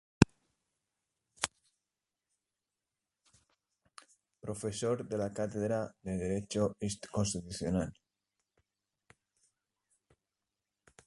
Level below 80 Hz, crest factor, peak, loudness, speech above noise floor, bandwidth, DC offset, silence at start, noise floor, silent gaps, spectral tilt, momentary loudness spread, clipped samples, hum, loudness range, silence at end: -56 dBFS; 34 dB; -4 dBFS; -35 LUFS; over 55 dB; 11.5 kHz; under 0.1%; 0.2 s; under -90 dBFS; none; -5.5 dB/octave; 9 LU; under 0.1%; none; 12 LU; 3.15 s